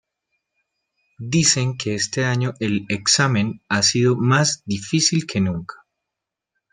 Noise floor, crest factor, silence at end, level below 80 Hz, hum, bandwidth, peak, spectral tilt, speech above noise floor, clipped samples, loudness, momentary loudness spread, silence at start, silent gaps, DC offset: -84 dBFS; 18 dB; 1 s; -58 dBFS; none; 11 kHz; -2 dBFS; -3.5 dB/octave; 64 dB; under 0.1%; -19 LUFS; 8 LU; 1.2 s; none; under 0.1%